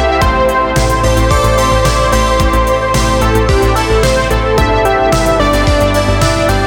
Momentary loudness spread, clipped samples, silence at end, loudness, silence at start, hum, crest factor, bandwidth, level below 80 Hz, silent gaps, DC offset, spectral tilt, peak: 1 LU; under 0.1%; 0 s; -11 LUFS; 0 s; none; 10 dB; 18 kHz; -16 dBFS; none; under 0.1%; -5 dB/octave; 0 dBFS